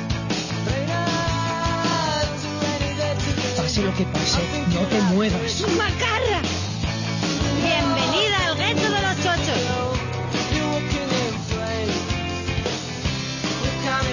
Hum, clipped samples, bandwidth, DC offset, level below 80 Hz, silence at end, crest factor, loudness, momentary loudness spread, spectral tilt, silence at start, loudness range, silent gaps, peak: none; under 0.1%; 7.4 kHz; under 0.1%; -36 dBFS; 0 s; 14 dB; -22 LUFS; 6 LU; -4.5 dB/octave; 0 s; 3 LU; none; -8 dBFS